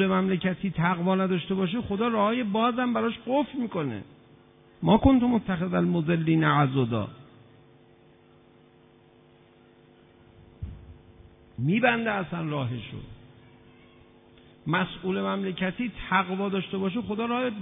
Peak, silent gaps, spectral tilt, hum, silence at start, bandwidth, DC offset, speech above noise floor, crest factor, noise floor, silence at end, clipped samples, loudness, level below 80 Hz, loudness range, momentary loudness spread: -6 dBFS; none; -11 dB/octave; none; 0 s; 3.9 kHz; under 0.1%; 31 dB; 22 dB; -57 dBFS; 0 s; under 0.1%; -26 LUFS; -50 dBFS; 8 LU; 15 LU